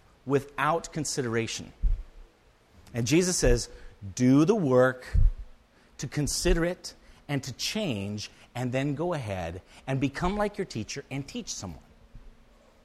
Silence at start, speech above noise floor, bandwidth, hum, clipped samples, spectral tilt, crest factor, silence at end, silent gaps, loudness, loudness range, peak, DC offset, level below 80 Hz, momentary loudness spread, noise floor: 0.25 s; 33 dB; 14 kHz; none; under 0.1%; -5 dB/octave; 18 dB; 0.55 s; none; -28 LUFS; 7 LU; -10 dBFS; under 0.1%; -36 dBFS; 15 LU; -60 dBFS